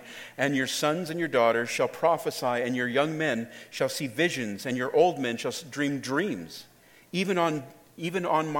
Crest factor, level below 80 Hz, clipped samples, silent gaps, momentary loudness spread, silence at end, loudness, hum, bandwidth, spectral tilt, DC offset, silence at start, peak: 20 dB; -74 dBFS; under 0.1%; none; 11 LU; 0 s; -28 LUFS; none; 17.5 kHz; -4.5 dB/octave; under 0.1%; 0 s; -8 dBFS